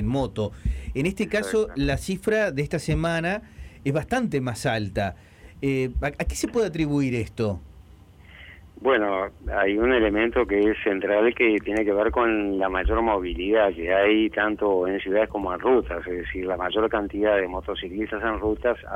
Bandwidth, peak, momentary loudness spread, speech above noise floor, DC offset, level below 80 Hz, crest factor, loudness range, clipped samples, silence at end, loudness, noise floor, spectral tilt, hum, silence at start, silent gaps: 16 kHz; -8 dBFS; 8 LU; 25 dB; under 0.1%; -38 dBFS; 16 dB; 5 LU; under 0.1%; 0 s; -24 LUFS; -49 dBFS; -6 dB/octave; none; 0 s; none